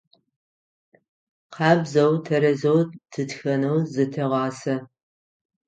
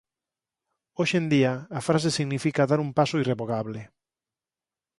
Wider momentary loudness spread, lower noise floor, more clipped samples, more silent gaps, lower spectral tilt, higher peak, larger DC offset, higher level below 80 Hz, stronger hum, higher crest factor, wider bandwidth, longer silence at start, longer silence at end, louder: about the same, 9 LU vs 8 LU; about the same, under -90 dBFS vs under -90 dBFS; neither; neither; about the same, -7 dB/octave vs -6 dB/octave; first, -4 dBFS vs -8 dBFS; neither; second, -70 dBFS vs -64 dBFS; neither; about the same, 20 dB vs 20 dB; second, 9 kHz vs 11.5 kHz; first, 1.5 s vs 1 s; second, 0.85 s vs 1.15 s; first, -22 LUFS vs -25 LUFS